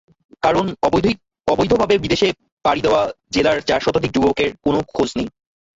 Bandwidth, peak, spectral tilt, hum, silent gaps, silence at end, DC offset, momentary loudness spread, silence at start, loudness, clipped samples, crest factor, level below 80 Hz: 8 kHz; -4 dBFS; -5.5 dB/octave; none; 2.52-2.57 s; 0.5 s; under 0.1%; 5 LU; 0.45 s; -18 LUFS; under 0.1%; 16 dB; -42 dBFS